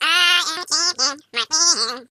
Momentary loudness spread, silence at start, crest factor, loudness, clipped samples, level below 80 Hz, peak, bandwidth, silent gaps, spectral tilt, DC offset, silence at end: 6 LU; 0 s; 18 dB; -17 LUFS; under 0.1%; -80 dBFS; -2 dBFS; 16 kHz; none; 3 dB/octave; under 0.1%; 0.05 s